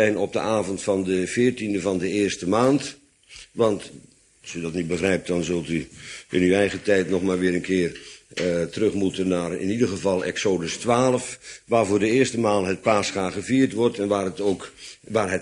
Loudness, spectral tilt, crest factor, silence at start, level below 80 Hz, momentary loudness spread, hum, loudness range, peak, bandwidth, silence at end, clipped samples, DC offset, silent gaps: -23 LUFS; -5 dB/octave; 18 dB; 0 s; -56 dBFS; 11 LU; none; 3 LU; -4 dBFS; 11 kHz; 0 s; under 0.1%; under 0.1%; none